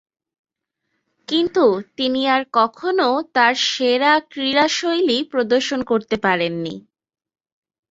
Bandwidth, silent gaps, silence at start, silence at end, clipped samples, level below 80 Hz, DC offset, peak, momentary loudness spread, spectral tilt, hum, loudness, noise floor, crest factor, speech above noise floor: 8 kHz; none; 1.3 s; 1.1 s; under 0.1%; -62 dBFS; under 0.1%; -2 dBFS; 6 LU; -3.5 dB/octave; none; -18 LUFS; -76 dBFS; 18 dB; 57 dB